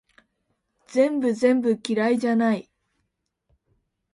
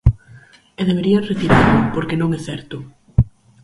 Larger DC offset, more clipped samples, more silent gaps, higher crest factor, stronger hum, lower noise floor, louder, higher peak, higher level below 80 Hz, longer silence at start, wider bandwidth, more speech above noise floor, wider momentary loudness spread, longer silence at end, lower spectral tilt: neither; neither; neither; about the same, 18 dB vs 18 dB; neither; first, -77 dBFS vs -45 dBFS; second, -22 LUFS vs -18 LUFS; second, -8 dBFS vs 0 dBFS; second, -70 dBFS vs -30 dBFS; first, 0.9 s vs 0.05 s; about the same, 11.5 kHz vs 11.5 kHz; first, 55 dB vs 29 dB; second, 4 LU vs 17 LU; first, 1.5 s vs 0.35 s; second, -6 dB/octave vs -7.5 dB/octave